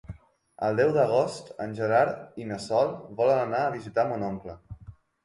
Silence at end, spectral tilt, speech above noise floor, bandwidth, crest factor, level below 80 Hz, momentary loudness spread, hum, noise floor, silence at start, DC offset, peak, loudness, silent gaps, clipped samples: 0.35 s; -6.5 dB/octave; 23 dB; 11.5 kHz; 18 dB; -58 dBFS; 18 LU; none; -49 dBFS; 0.1 s; under 0.1%; -10 dBFS; -27 LUFS; none; under 0.1%